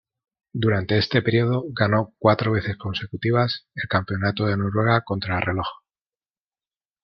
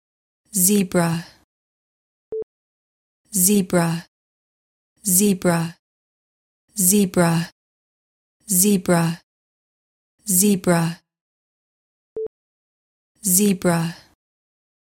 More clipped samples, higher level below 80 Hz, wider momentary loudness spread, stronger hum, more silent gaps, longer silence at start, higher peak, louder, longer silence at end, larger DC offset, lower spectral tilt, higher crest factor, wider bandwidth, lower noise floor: neither; first, -54 dBFS vs -60 dBFS; second, 8 LU vs 16 LU; neither; second, none vs 1.44-2.32 s, 2.43-3.24 s, 4.08-4.96 s, 5.79-6.68 s, 7.52-8.40 s, 9.23-10.18 s, 11.21-12.16 s, 12.27-13.15 s; about the same, 0.55 s vs 0.55 s; about the same, -2 dBFS vs -2 dBFS; second, -23 LUFS vs -18 LUFS; first, 1.25 s vs 0.95 s; neither; first, -8.5 dB/octave vs -4.5 dB/octave; about the same, 20 dB vs 20 dB; second, 6 kHz vs 17 kHz; about the same, under -90 dBFS vs under -90 dBFS